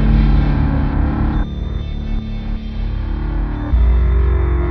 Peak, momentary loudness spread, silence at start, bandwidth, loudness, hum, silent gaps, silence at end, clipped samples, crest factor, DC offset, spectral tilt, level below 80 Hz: -2 dBFS; 10 LU; 0 s; 4.9 kHz; -19 LUFS; none; none; 0 s; under 0.1%; 14 dB; under 0.1%; -10 dB/octave; -16 dBFS